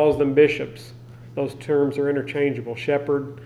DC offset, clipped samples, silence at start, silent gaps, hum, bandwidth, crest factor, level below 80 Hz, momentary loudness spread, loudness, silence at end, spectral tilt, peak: under 0.1%; under 0.1%; 0 s; none; none; 11.5 kHz; 18 dB; -54 dBFS; 16 LU; -22 LUFS; 0 s; -7.5 dB/octave; -4 dBFS